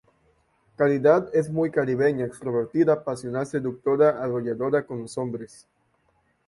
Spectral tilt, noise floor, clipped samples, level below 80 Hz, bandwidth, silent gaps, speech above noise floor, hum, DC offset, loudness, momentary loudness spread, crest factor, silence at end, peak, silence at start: -7.5 dB/octave; -68 dBFS; under 0.1%; -64 dBFS; 11.5 kHz; none; 44 dB; none; under 0.1%; -24 LUFS; 11 LU; 18 dB; 1 s; -6 dBFS; 0.8 s